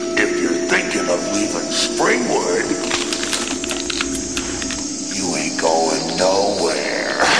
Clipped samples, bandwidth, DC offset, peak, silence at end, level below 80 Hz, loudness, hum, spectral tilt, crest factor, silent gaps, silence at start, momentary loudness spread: under 0.1%; 11 kHz; 0.5%; -4 dBFS; 0 s; -46 dBFS; -19 LUFS; none; -2 dB/octave; 16 dB; none; 0 s; 5 LU